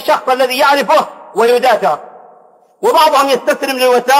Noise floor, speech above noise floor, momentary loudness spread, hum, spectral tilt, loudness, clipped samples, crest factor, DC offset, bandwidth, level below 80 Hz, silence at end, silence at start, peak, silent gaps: -45 dBFS; 35 dB; 7 LU; none; -2.5 dB/octave; -12 LUFS; under 0.1%; 12 dB; under 0.1%; 16 kHz; -64 dBFS; 0 s; 0 s; 0 dBFS; none